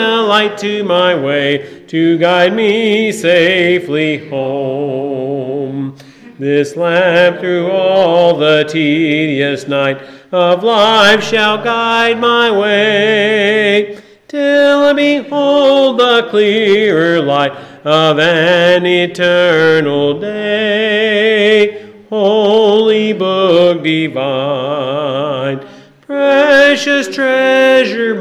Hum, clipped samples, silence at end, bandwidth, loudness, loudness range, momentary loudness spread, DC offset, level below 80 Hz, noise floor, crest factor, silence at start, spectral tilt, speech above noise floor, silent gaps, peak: none; under 0.1%; 0 s; 12.5 kHz; -11 LUFS; 4 LU; 9 LU; under 0.1%; -60 dBFS; -35 dBFS; 12 dB; 0 s; -5 dB/octave; 24 dB; none; 0 dBFS